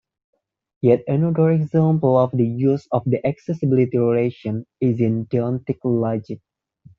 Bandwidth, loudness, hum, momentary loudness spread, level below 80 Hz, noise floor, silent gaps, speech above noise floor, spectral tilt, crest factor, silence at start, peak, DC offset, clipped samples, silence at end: 6.4 kHz; -20 LUFS; none; 7 LU; -60 dBFS; -52 dBFS; none; 33 dB; -10 dB/octave; 16 dB; 0.85 s; -4 dBFS; under 0.1%; under 0.1%; 0.6 s